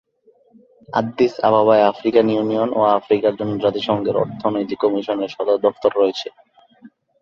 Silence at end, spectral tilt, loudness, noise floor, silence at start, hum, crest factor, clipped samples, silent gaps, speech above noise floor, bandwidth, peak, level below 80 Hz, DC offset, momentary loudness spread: 0.35 s; -7 dB/octave; -18 LUFS; -56 dBFS; 0.9 s; none; 18 dB; under 0.1%; none; 39 dB; 7 kHz; -2 dBFS; -60 dBFS; under 0.1%; 7 LU